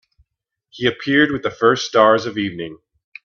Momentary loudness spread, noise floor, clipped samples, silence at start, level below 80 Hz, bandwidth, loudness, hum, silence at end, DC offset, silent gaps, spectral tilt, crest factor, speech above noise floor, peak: 11 LU; -77 dBFS; under 0.1%; 0.75 s; -58 dBFS; 7.2 kHz; -17 LUFS; none; 0.5 s; under 0.1%; none; -4.5 dB/octave; 20 dB; 60 dB; 0 dBFS